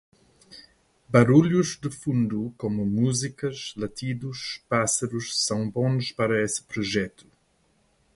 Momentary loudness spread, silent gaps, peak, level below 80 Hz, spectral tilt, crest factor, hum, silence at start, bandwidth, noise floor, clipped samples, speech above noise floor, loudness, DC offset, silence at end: 13 LU; none; -4 dBFS; -58 dBFS; -5 dB/octave; 22 dB; none; 0.5 s; 11.5 kHz; -66 dBFS; under 0.1%; 42 dB; -25 LUFS; under 0.1%; 1.05 s